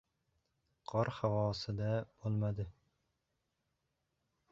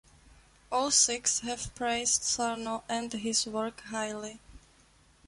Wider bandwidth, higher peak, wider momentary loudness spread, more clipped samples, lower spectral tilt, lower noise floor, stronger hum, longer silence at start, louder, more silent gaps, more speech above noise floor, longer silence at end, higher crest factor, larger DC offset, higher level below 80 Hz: second, 7.4 kHz vs 11.5 kHz; second, -20 dBFS vs -10 dBFS; second, 9 LU vs 13 LU; neither; first, -6.5 dB/octave vs -1 dB/octave; first, -85 dBFS vs -62 dBFS; neither; first, 0.9 s vs 0.7 s; second, -38 LUFS vs -29 LUFS; neither; first, 48 dB vs 31 dB; first, 1.8 s vs 0.7 s; about the same, 20 dB vs 22 dB; neither; about the same, -62 dBFS vs -60 dBFS